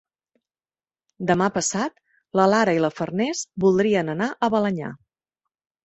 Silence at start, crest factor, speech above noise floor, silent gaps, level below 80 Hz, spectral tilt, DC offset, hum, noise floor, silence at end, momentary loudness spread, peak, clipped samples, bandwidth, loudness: 1.2 s; 20 dB; over 69 dB; none; -60 dBFS; -5 dB/octave; under 0.1%; none; under -90 dBFS; 0.9 s; 10 LU; -4 dBFS; under 0.1%; 8.4 kHz; -22 LUFS